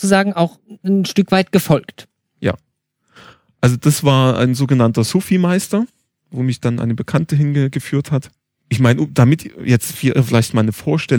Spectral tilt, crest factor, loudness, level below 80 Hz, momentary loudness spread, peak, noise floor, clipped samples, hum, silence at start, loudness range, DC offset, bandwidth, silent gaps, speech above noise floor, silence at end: -6 dB/octave; 16 dB; -16 LUFS; -50 dBFS; 9 LU; 0 dBFS; -68 dBFS; under 0.1%; none; 0 s; 3 LU; under 0.1%; 19.5 kHz; none; 53 dB; 0 s